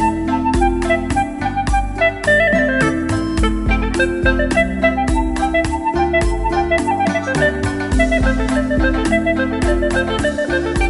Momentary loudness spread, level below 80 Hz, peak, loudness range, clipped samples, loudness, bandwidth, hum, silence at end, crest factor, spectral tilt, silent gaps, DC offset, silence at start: 4 LU; -24 dBFS; 0 dBFS; 1 LU; under 0.1%; -17 LUFS; 11.5 kHz; none; 0 s; 16 dB; -6 dB/octave; none; under 0.1%; 0 s